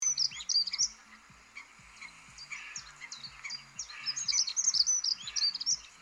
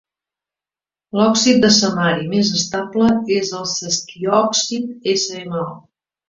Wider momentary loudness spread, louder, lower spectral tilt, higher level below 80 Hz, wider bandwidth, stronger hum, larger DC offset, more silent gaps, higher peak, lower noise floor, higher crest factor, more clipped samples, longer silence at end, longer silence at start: first, 22 LU vs 10 LU; second, -29 LUFS vs -17 LUFS; second, 3.5 dB/octave vs -3.5 dB/octave; second, -70 dBFS vs -56 dBFS; first, 16 kHz vs 7.8 kHz; neither; neither; neither; second, -14 dBFS vs 0 dBFS; second, -56 dBFS vs under -90 dBFS; about the same, 20 dB vs 18 dB; neither; second, 0 s vs 0.5 s; second, 0 s vs 1.15 s